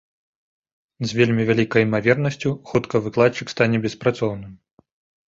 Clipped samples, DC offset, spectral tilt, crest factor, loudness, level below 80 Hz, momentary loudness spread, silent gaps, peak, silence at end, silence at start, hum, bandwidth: under 0.1%; under 0.1%; -6.5 dB/octave; 20 dB; -20 LUFS; -54 dBFS; 8 LU; none; -2 dBFS; 0.75 s; 1 s; none; 7.8 kHz